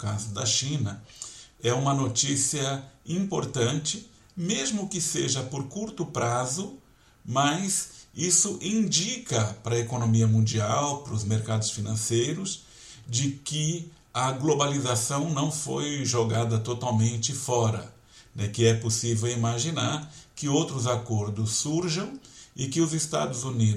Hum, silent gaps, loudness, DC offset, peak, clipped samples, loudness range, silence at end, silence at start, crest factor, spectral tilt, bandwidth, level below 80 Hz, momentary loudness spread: none; none; -27 LUFS; under 0.1%; -8 dBFS; under 0.1%; 4 LU; 0 s; 0 s; 20 dB; -4 dB/octave; 13.5 kHz; -60 dBFS; 11 LU